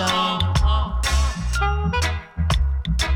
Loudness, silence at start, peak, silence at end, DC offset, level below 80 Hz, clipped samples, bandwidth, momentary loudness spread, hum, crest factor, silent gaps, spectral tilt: -22 LUFS; 0 s; -6 dBFS; 0 s; under 0.1%; -22 dBFS; under 0.1%; 15 kHz; 3 LU; none; 14 dB; none; -4.5 dB/octave